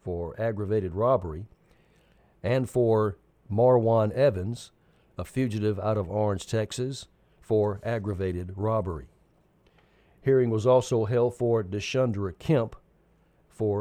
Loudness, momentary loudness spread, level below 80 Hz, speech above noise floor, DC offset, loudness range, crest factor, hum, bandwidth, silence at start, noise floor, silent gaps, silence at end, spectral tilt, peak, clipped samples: -27 LUFS; 13 LU; -54 dBFS; 38 dB; under 0.1%; 5 LU; 16 dB; none; 13.5 kHz; 0.05 s; -63 dBFS; none; 0 s; -7 dB/octave; -10 dBFS; under 0.1%